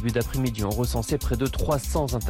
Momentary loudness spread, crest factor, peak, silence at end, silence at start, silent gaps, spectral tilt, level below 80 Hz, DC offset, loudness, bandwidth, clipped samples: 2 LU; 12 dB; -12 dBFS; 0 s; 0 s; none; -5.5 dB/octave; -32 dBFS; under 0.1%; -26 LUFS; 17 kHz; under 0.1%